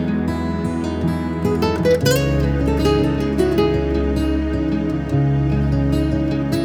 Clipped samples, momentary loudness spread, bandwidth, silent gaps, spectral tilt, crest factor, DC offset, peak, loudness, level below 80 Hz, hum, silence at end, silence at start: under 0.1%; 5 LU; 17 kHz; none; -7 dB/octave; 14 dB; under 0.1%; -4 dBFS; -19 LUFS; -28 dBFS; none; 0 s; 0 s